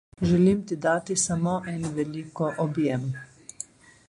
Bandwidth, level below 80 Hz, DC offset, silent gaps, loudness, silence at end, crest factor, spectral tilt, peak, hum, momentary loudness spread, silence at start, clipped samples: 11.5 kHz; -54 dBFS; under 0.1%; none; -26 LUFS; 0.45 s; 16 dB; -5.5 dB/octave; -10 dBFS; none; 18 LU; 0.2 s; under 0.1%